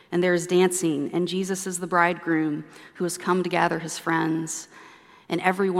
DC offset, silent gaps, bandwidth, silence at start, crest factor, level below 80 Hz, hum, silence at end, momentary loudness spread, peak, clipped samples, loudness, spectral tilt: under 0.1%; none; 15.5 kHz; 0.1 s; 20 dB; -74 dBFS; none; 0 s; 10 LU; -4 dBFS; under 0.1%; -25 LUFS; -4.5 dB/octave